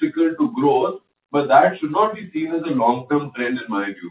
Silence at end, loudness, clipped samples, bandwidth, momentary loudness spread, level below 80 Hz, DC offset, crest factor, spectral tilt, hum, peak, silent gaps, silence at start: 0 s; -20 LUFS; under 0.1%; 4 kHz; 10 LU; -66 dBFS; under 0.1%; 18 dB; -10.5 dB/octave; none; -2 dBFS; none; 0 s